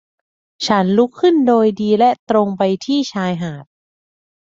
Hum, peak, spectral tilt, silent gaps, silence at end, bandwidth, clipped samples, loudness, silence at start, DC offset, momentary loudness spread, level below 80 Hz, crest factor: none; -2 dBFS; -6 dB/octave; 2.19-2.27 s; 0.95 s; 7.8 kHz; under 0.1%; -16 LUFS; 0.6 s; under 0.1%; 10 LU; -60 dBFS; 14 dB